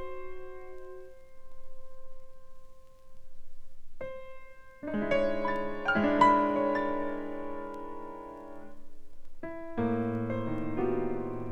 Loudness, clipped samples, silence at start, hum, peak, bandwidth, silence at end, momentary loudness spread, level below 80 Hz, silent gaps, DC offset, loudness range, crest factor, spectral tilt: -31 LUFS; under 0.1%; 0 s; none; -10 dBFS; 8.2 kHz; 0 s; 21 LU; -50 dBFS; none; under 0.1%; 22 LU; 22 dB; -7.5 dB/octave